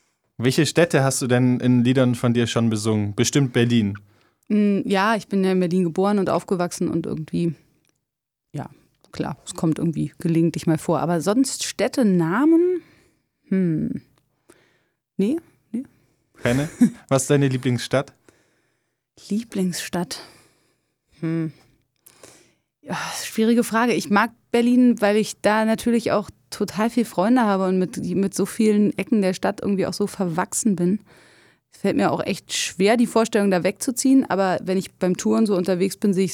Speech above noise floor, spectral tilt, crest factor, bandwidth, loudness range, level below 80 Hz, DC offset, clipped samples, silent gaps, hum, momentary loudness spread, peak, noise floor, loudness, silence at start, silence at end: 61 dB; -5.5 dB/octave; 18 dB; 16.5 kHz; 8 LU; -60 dBFS; under 0.1%; under 0.1%; none; none; 10 LU; -4 dBFS; -82 dBFS; -21 LUFS; 0.4 s; 0 s